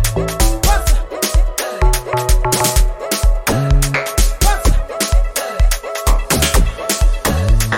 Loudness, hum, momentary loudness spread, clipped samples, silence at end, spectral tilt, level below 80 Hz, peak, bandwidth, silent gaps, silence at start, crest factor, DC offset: -16 LUFS; none; 4 LU; under 0.1%; 0 s; -3.5 dB/octave; -16 dBFS; 0 dBFS; 17 kHz; none; 0 s; 12 dB; under 0.1%